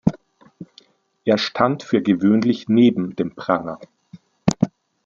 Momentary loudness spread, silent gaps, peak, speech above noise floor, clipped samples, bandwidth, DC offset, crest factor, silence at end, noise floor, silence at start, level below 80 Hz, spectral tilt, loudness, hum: 10 LU; none; -2 dBFS; 35 dB; under 0.1%; 7.6 kHz; under 0.1%; 18 dB; 0.35 s; -54 dBFS; 0.05 s; -52 dBFS; -6.5 dB/octave; -20 LUFS; none